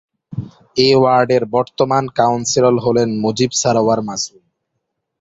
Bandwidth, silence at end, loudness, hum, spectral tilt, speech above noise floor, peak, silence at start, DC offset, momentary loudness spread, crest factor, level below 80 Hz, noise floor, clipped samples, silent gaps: 8 kHz; 0.95 s; -15 LUFS; none; -4.5 dB/octave; 59 dB; 0 dBFS; 0.3 s; under 0.1%; 13 LU; 16 dB; -52 dBFS; -74 dBFS; under 0.1%; none